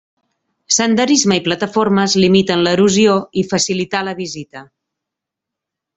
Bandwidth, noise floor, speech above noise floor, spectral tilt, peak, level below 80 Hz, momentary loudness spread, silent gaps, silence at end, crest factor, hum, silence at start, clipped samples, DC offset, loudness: 8.4 kHz; -82 dBFS; 68 dB; -4 dB/octave; 0 dBFS; -54 dBFS; 11 LU; none; 1.35 s; 16 dB; none; 0.7 s; under 0.1%; under 0.1%; -14 LUFS